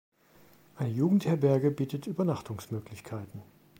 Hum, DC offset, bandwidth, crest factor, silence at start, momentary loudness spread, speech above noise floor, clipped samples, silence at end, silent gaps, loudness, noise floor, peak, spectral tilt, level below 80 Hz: none; under 0.1%; 16.5 kHz; 18 dB; 0.75 s; 16 LU; 30 dB; under 0.1%; 0.35 s; none; -30 LUFS; -60 dBFS; -12 dBFS; -8.5 dB/octave; -68 dBFS